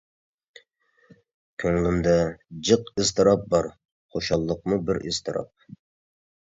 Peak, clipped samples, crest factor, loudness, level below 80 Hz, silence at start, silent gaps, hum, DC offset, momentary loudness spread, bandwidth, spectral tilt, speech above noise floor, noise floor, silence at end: -4 dBFS; under 0.1%; 22 dB; -24 LUFS; -46 dBFS; 1.6 s; 3.92-4.09 s; none; under 0.1%; 12 LU; 7.8 kHz; -5 dB/octave; 41 dB; -64 dBFS; 1.05 s